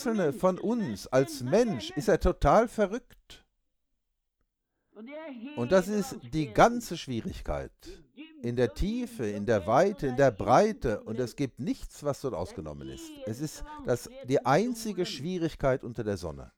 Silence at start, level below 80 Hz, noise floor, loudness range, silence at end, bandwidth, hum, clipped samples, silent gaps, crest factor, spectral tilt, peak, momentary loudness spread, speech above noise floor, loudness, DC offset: 0 s; -44 dBFS; -79 dBFS; 7 LU; 0.1 s; 18 kHz; none; under 0.1%; none; 20 dB; -6 dB/octave; -8 dBFS; 15 LU; 51 dB; -29 LUFS; under 0.1%